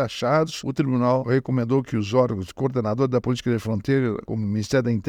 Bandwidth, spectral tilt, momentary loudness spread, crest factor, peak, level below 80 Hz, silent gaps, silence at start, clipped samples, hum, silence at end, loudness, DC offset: 13.5 kHz; -7 dB/octave; 5 LU; 16 dB; -6 dBFS; -54 dBFS; none; 0 s; under 0.1%; none; 0 s; -23 LUFS; under 0.1%